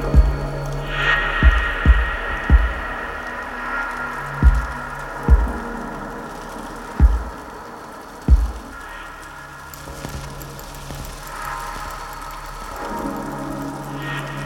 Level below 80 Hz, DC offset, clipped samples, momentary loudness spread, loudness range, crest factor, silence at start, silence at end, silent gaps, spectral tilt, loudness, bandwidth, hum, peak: -22 dBFS; under 0.1%; under 0.1%; 16 LU; 12 LU; 20 dB; 0 s; 0 s; none; -6 dB/octave; -22 LUFS; 14.5 kHz; none; -2 dBFS